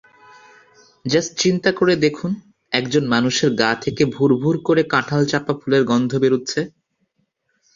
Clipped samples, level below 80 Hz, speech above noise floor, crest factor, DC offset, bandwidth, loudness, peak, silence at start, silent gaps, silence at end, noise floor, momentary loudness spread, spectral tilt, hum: under 0.1%; -56 dBFS; 51 dB; 18 dB; under 0.1%; 7.6 kHz; -18 LUFS; -2 dBFS; 1.05 s; none; 1.1 s; -69 dBFS; 8 LU; -5 dB/octave; none